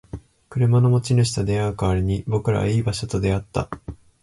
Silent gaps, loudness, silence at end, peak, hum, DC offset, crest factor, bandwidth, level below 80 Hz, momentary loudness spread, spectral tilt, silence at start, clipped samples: none; -21 LUFS; 0.25 s; -8 dBFS; none; under 0.1%; 14 dB; 11.5 kHz; -38 dBFS; 15 LU; -6.5 dB/octave; 0.15 s; under 0.1%